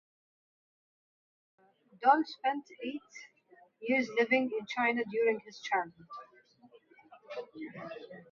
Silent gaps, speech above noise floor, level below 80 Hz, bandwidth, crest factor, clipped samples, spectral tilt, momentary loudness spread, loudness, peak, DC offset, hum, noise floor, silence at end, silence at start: none; 31 dB; -86 dBFS; 7.2 kHz; 24 dB; under 0.1%; -2 dB/octave; 20 LU; -32 LUFS; -12 dBFS; under 0.1%; none; -63 dBFS; 0.1 s; 2 s